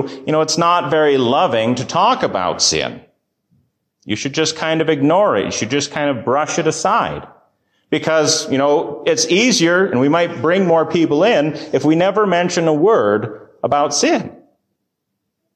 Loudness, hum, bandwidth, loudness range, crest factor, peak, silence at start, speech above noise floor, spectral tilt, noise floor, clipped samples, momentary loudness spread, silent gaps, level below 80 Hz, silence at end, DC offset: -15 LUFS; none; 13.5 kHz; 4 LU; 14 dB; -4 dBFS; 0 s; 59 dB; -4 dB/octave; -75 dBFS; under 0.1%; 7 LU; none; -54 dBFS; 1.2 s; under 0.1%